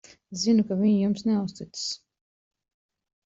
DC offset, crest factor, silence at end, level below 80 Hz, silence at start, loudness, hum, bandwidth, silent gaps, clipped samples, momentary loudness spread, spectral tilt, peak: under 0.1%; 16 dB; 1.4 s; -66 dBFS; 0.3 s; -25 LUFS; none; 7.8 kHz; none; under 0.1%; 12 LU; -5.5 dB/octave; -12 dBFS